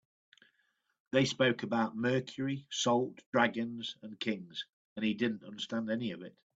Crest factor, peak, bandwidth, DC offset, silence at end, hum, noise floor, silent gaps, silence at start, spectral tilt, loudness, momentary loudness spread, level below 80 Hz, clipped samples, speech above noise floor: 22 dB; -12 dBFS; 8 kHz; under 0.1%; 0.25 s; none; -78 dBFS; 3.26-3.33 s, 4.69-4.96 s; 1.15 s; -4.5 dB/octave; -34 LUFS; 11 LU; -74 dBFS; under 0.1%; 44 dB